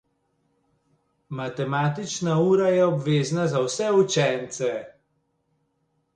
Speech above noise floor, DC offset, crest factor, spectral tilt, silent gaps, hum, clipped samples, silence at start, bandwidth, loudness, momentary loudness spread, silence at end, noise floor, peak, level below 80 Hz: 49 dB; under 0.1%; 16 dB; -5.5 dB/octave; none; none; under 0.1%; 1.3 s; 9.8 kHz; -23 LUFS; 10 LU; 1.25 s; -72 dBFS; -8 dBFS; -66 dBFS